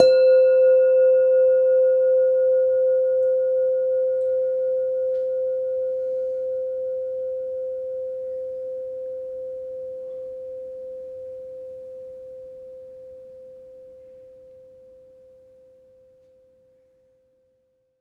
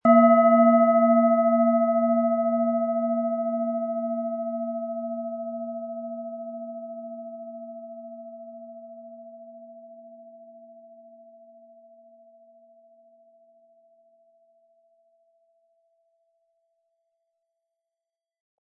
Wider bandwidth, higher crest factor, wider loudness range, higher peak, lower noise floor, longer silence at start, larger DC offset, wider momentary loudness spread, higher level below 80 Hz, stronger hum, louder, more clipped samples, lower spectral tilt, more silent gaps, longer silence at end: first, 4.3 kHz vs 3 kHz; about the same, 22 dB vs 20 dB; second, 22 LU vs 26 LU; first, 0 dBFS vs -6 dBFS; second, -68 dBFS vs -89 dBFS; about the same, 0 s vs 0.05 s; neither; second, 23 LU vs 26 LU; first, -68 dBFS vs -84 dBFS; neither; about the same, -21 LUFS vs -23 LUFS; neither; second, -4.5 dB/octave vs -11 dB/octave; neither; second, 3.75 s vs 8.05 s